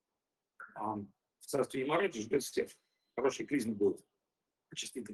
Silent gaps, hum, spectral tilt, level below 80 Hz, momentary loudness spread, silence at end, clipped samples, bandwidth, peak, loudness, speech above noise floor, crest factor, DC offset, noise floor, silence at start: none; none; -4.5 dB/octave; -76 dBFS; 15 LU; 0 s; under 0.1%; 12.5 kHz; -18 dBFS; -36 LUFS; 54 dB; 18 dB; under 0.1%; -90 dBFS; 0.6 s